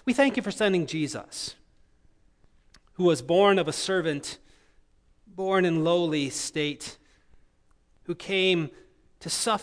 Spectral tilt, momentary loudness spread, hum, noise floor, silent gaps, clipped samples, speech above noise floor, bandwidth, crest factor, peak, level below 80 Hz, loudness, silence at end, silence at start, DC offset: -4 dB/octave; 16 LU; none; -63 dBFS; none; under 0.1%; 37 dB; 11 kHz; 20 dB; -6 dBFS; -62 dBFS; -26 LUFS; 0 s; 0.05 s; under 0.1%